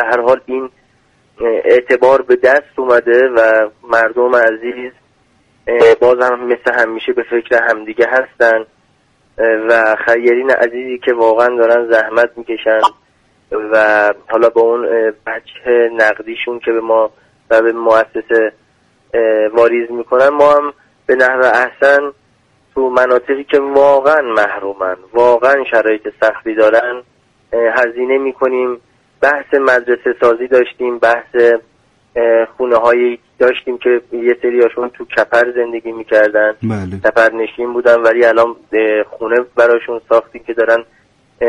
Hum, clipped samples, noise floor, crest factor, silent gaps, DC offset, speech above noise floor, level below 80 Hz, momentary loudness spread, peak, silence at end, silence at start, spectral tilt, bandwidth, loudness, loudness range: none; under 0.1%; -55 dBFS; 12 dB; none; under 0.1%; 43 dB; -54 dBFS; 9 LU; 0 dBFS; 0 s; 0 s; -5.5 dB/octave; 9.6 kHz; -12 LUFS; 2 LU